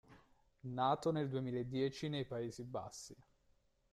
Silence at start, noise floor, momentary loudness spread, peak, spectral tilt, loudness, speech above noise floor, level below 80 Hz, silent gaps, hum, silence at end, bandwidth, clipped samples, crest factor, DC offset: 0.1 s; -75 dBFS; 15 LU; -24 dBFS; -6 dB/octave; -41 LUFS; 35 dB; -72 dBFS; none; none; 0.7 s; 13.5 kHz; under 0.1%; 18 dB; under 0.1%